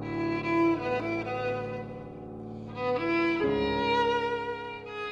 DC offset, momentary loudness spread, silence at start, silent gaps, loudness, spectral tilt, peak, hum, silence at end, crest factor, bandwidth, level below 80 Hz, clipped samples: under 0.1%; 15 LU; 0 s; none; -29 LUFS; -6.5 dB/octave; -16 dBFS; none; 0 s; 14 dB; 7.6 kHz; -54 dBFS; under 0.1%